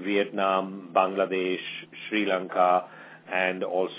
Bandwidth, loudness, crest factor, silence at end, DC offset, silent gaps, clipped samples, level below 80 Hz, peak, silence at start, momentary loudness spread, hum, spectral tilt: 4 kHz; -26 LUFS; 20 dB; 0 s; under 0.1%; none; under 0.1%; -82 dBFS; -8 dBFS; 0 s; 11 LU; none; -8.5 dB/octave